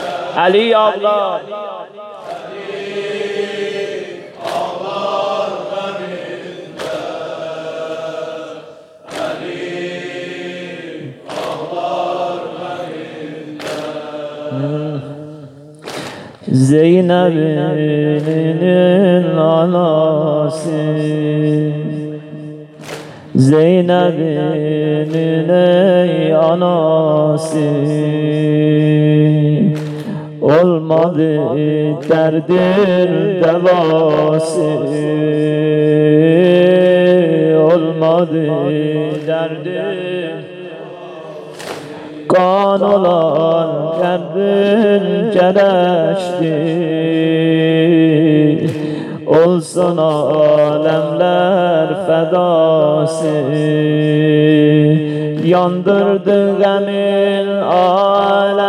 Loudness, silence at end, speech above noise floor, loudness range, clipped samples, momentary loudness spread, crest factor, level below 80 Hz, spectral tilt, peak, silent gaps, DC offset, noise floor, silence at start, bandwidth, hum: -13 LUFS; 0 s; 25 dB; 11 LU; under 0.1%; 16 LU; 14 dB; -62 dBFS; -7.5 dB/octave; 0 dBFS; none; under 0.1%; -37 dBFS; 0 s; 11.5 kHz; none